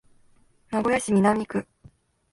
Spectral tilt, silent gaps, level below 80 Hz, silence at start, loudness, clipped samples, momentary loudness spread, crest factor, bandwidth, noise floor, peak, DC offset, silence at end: -6 dB/octave; none; -58 dBFS; 0.7 s; -24 LUFS; under 0.1%; 10 LU; 18 dB; 11.5 kHz; -59 dBFS; -8 dBFS; under 0.1%; 0.7 s